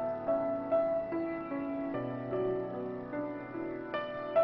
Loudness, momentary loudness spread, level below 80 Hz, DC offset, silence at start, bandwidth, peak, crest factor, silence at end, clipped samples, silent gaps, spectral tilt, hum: -35 LUFS; 8 LU; -64 dBFS; under 0.1%; 0 s; 5.6 kHz; -18 dBFS; 16 dB; 0 s; under 0.1%; none; -9.5 dB/octave; none